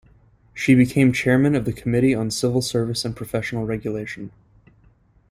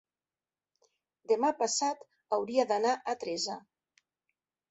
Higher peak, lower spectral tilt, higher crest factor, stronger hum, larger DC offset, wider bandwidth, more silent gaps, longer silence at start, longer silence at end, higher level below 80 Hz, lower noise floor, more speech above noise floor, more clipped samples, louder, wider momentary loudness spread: first, -2 dBFS vs -14 dBFS; first, -6 dB/octave vs -2 dB/octave; about the same, 18 dB vs 20 dB; neither; neither; first, 15.5 kHz vs 8.4 kHz; neither; second, 0.55 s vs 1.3 s; about the same, 1 s vs 1.1 s; first, -50 dBFS vs -82 dBFS; second, -56 dBFS vs under -90 dBFS; second, 36 dB vs over 59 dB; neither; first, -21 LUFS vs -31 LUFS; first, 13 LU vs 8 LU